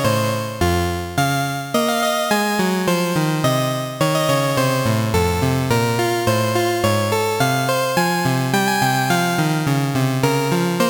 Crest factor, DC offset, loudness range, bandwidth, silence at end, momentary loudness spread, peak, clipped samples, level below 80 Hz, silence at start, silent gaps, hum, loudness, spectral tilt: 16 dB; under 0.1%; 1 LU; over 20 kHz; 0 s; 2 LU; -4 dBFS; under 0.1%; -42 dBFS; 0 s; none; none; -18 LUFS; -5 dB/octave